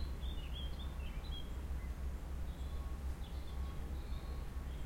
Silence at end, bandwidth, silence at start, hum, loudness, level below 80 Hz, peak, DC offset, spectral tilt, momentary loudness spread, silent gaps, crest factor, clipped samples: 0 s; 16.5 kHz; 0 s; none; -46 LUFS; -44 dBFS; -30 dBFS; under 0.1%; -6 dB/octave; 2 LU; none; 12 dB; under 0.1%